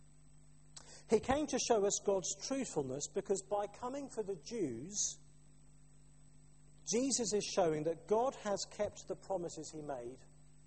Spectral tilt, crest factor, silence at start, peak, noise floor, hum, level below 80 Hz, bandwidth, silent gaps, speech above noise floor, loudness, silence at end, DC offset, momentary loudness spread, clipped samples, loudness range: -3.5 dB/octave; 22 dB; 0.75 s; -18 dBFS; -64 dBFS; none; -66 dBFS; 8.8 kHz; none; 26 dB; -37 LUFS; 0.5 s; under 0.1%; 13 LU; under 0.1%; 5 LU